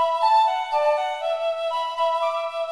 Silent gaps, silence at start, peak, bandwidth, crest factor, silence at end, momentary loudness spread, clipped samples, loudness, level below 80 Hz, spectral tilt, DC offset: none; 0 s; -10 dBFS; 12 kHz; 12 dB; 0 s; 7 LU; under 0.1%; -22 LUFS; -70 dBFS; 1 dB/octave; 0.1%